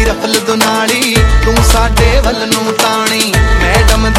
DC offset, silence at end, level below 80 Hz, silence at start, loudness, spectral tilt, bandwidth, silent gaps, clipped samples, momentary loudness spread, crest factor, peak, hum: under 0.1%; 0 s; -14 dBFS; 0 s; -10 LUFS; -4 dB/octave; 16.5 kHz; none; under 0.1%; 3 LU; 10 dB; 0 dBFS; none